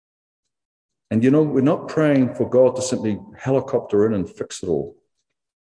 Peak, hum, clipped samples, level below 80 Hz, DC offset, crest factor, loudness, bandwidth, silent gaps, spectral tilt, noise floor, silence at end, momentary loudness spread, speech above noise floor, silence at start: -6 dBFS; none; under 0.1%; -58 dBFS; under 0.1%; 16 dB; -20 LUFS; 10.5 kHz; none; -6.5 dB/octave; -77 dBFS; 0.75 s; 10 LU; 58 dB; 1.1 s